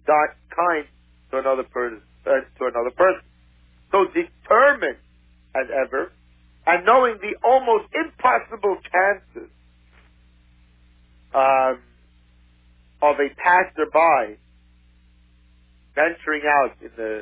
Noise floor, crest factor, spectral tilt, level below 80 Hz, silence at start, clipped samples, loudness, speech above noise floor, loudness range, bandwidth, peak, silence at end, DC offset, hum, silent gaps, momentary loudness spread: -55 dBFS; 18 dB; -7.5 dB/octave; -54 dBFS; 0.05 s; under 0.1%; -20 LUFS; 35 dB; 5 LU; 4 kHz; -4 dBFS; 0 s; under 0.1%; 60 Hz at -55 dBFS; none; 13 LU